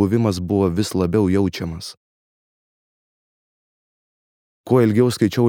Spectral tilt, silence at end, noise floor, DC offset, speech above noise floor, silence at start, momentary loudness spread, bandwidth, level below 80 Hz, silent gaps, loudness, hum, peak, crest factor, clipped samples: -7 dB/octave; 0 s; under -90 dBFS; under 0.1%; over 72 dB; 0 s; 12 LU; 18 kHz; -48 dBFS; 1.97-4.64 s; -19 LUFS; none; -2 dBFS; 18 dB; under 0.1%